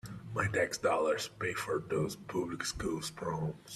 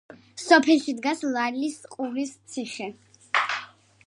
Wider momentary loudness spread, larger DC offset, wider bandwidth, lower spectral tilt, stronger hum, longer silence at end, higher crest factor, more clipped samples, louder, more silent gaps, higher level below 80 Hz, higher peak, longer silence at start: second, 7 LU vs 17 LU; neither; first, 14.5 kHz vs 11.5 kHz; first, -4.5 dB/octave vs -2.5 dB/octave; neither; second, 0 s vs 0.4 s; about the same, 18 dB vs 22 dB; neither; second, -35 LUFS vs -25 LUFS; neither; first, -58 dBFS vs -76 dBFS; second, -18 dBFS vs -4 dBFS; about the same, 0.05 s vs 0.1 s